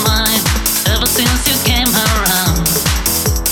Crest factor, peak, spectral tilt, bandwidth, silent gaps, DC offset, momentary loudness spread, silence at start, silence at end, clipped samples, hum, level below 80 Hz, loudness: 12 dB; -2 dBFS; -2.5 dB/octave; 18.5 kHz; none; under 0.1%; 2 LU; 0 s; 0 s; under 0.1%; none; -20 dBFS; -12 LUFS